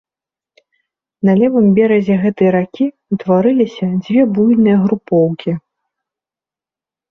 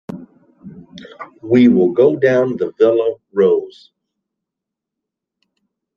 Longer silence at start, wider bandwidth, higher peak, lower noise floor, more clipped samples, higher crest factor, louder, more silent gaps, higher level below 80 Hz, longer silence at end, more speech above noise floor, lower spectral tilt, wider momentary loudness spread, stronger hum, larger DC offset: first, 1.25 s vs 0.1 s; about the same, 6.2 kHz vs 6.8 kHz; about the same, -2 dBFS vs -2 dBFS; first, -89 dBFS vs -82 dBFS; neither; about the same, 12 dB vs 16 dB; about the same, -14 LUFS vs -14 LUFS; neither; about the same, -56 dBFS vs -60 dBFS; second, 1.5 s vs 2.25 s; first, 77 dB vs 69 dB; about the same, -9.5 dB/octave vs -8.5 dB/octave; second, 9 LU vs 23 LU; neither; neither